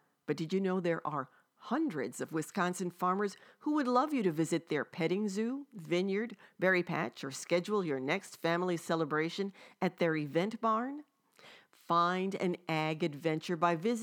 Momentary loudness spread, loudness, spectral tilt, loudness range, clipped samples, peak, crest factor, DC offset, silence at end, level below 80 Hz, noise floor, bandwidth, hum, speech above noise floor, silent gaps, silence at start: 8 LU; -34 LUFS; -5.5 dB/octave; 2 LU; under 0.1%; -14 dBFS; 20 dB; under 0.1%; 0 s; under -90 dBFS; -60 dBFS; 18 kHz; none; 26 dB; none; 0.3 s